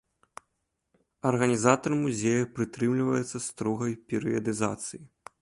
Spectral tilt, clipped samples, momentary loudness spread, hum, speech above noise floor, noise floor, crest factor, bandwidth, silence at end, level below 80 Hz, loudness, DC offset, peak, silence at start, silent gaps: -5.5 dB/octave; under 0.1%; 8 LU; none; 52 dB; -80 dBFS; 22 dB; 11.5 kHz; 0.35 s; -64 dBFS; -28 LUFS; under 0.1%; -6 dBFS; 1.25 s; none